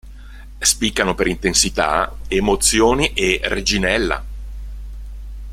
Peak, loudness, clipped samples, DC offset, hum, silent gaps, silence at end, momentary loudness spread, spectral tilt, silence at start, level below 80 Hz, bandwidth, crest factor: 0 dBFS; -17 LUFS; under 0.1%; under 0.1%; none; none; 0 s; 20 LU; -2.5 dB/octave; 0.05 s; -30 dBFS; 16.5 kHz; 20 dB